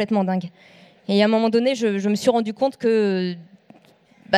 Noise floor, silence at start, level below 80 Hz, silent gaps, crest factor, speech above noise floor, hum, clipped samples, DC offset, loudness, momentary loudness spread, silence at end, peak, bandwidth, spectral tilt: -54 dBFS; 0 s; -72 dBFS; none; 16 dB; 34 dB; none; under 0.1%; under 0.1%; -21 LUFS; 11 LU; 0 s; -4 dBFS; 13 kHz; -6 dB/octave